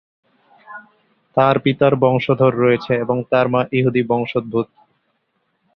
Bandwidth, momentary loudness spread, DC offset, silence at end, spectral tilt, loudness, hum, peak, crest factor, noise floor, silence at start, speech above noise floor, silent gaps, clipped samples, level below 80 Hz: 6 kHz; 16 LU; under 0.1%; 1.1 s; -9.5 dB/octave; -17 LUFS; none; -2 dBFS; 18 dB; -68 dBFS; 0.7 s; 52 dB; none; under 0.1%; -56 dBFS